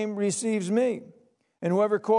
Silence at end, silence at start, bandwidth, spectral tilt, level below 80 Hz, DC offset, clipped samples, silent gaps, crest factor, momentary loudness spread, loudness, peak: 0 s; 0 s; 11 kHz; -5.5 dB/octave; -84 dBFS; under 0.1%; under 0.1%; none; 14 dB; 7 LU; -27 LUFS; -12 dBFS